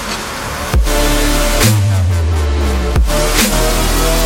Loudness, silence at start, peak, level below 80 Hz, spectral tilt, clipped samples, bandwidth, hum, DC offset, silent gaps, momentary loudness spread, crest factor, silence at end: -14 LUFS; 0 s; 0 dBFS; -16 dBFS; -4 dB/octave; under 0.1%; 17 kHz; none; under 0.1%; none; 6 LU; 12 dB; 0 s